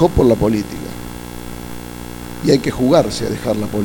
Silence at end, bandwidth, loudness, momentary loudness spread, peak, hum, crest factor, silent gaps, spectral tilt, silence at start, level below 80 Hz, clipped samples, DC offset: 0 s; 19 kHz; -16 LUFS; 17 LU; 0 dBFS; 60 Hz at -35 dBFS; 16 dB; none; -6 dB/octave; 0 s; -32 dBFS; under 0.1%; under 0.1%